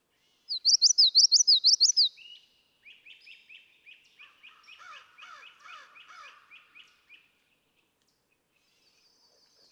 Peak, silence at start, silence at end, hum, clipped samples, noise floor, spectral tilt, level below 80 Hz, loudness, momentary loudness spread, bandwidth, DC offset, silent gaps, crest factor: -12 dBFS; 0.5 s; 3.95 s; none; under 0.1%; -74 dBFS; 7 dB/octave; under -90 dBFS; -20 LUFS; 8 LU; 11.5 kHz; under 0.1%; none; 18 dB